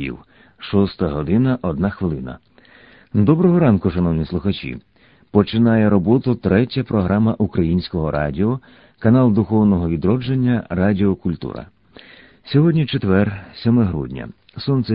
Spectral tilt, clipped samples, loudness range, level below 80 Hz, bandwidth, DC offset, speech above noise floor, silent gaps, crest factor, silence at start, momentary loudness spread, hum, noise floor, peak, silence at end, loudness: -13 dB/octave; under 0.1%; 3 LU; -40 dBFS; 5.2 kHz; under 0.1%; 31 dB; none; 18 dB; 0 s; 14 LU; none; -48 dBFS; 0 dBFS; 0 s; -18 LUFS